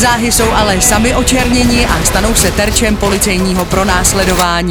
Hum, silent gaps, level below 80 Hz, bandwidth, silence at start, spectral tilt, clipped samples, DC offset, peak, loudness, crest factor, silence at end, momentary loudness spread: none; none; -20 dBFS; over 20 kHz; 0 s; -3.5 dB/octave; 0.1%; under 0.1%; 0 dBFS; -10 LUFS; 10 dB; 0 s; 3 LU